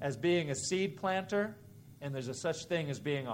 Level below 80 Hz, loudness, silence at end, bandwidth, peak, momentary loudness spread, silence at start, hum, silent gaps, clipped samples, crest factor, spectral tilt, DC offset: -72 dBFS; -35 LUFS; 0 s; 16 kHz; -18 dBFS; 9 LU; 0 s; none; none; under 0.1%; 16 dB; -5 dB/octave; under 0.1%